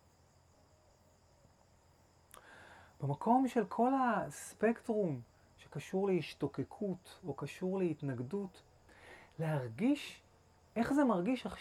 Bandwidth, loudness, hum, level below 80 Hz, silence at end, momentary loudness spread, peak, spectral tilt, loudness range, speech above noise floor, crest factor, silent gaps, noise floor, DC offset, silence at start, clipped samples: 14 kHz; -36 LUFS; none; -70 dBFS; 0 s; 18 LU; -18 dBFS; -7 dB/octave; 6 LU; 32 dB; 20 dB; none; -67 dBFS; under 0.1%; 2.45 s; under 0.1%